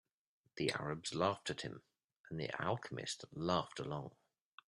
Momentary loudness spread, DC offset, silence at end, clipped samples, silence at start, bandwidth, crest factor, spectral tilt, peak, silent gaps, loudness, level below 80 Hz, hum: 12 LU; under 0.1%; 0.6 s; under 0.1%; 0.55 s; 12.5 kHz; 22 dB; -4.5 dB/octave; -20 dBFS; 2.16-2.24 s; -41 LUFS; -72 dBFS; none